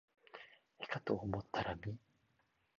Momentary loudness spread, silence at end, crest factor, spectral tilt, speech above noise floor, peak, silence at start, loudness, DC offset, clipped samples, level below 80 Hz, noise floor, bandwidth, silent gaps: 17 LU; 0.8 s; 24 dB; -4.5 dB/octave; 37 dB; -22 dBFS; 0.35 s; -42 LUFS; under 0.1%; under 0.1%; -64 dBFS; -79 dBFS; 7.2 kHz; none